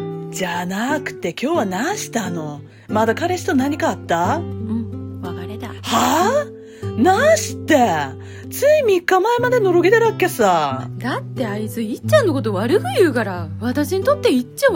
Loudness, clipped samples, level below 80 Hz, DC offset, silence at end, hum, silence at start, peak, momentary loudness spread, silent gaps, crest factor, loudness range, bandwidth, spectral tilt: -18 LUFS; under 0.1%; -56 dBFS; under 0.1%; 0 s; none; 0 s; -2 dBFS; 13 LU; none; 16 dB; 5 LU; 16.5 kHz; -5 dB/octave